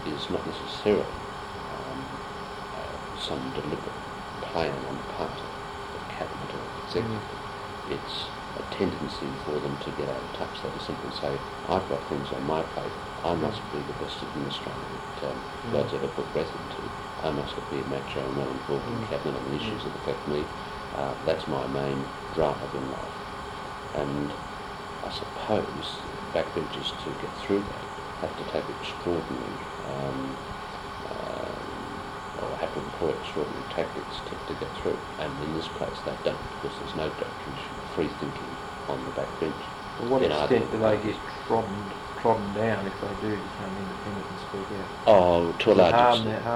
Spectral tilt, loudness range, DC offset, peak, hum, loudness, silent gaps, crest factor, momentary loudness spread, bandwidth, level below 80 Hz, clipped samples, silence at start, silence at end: -5.5 dB/octave; 6 LU; under 0.1%; -6 dBFS; none; -30 LUFS; none; 22 dB; 11 LU; 16.5 kHz; -50 dBFS; under 0.1%; 0 s; 0 s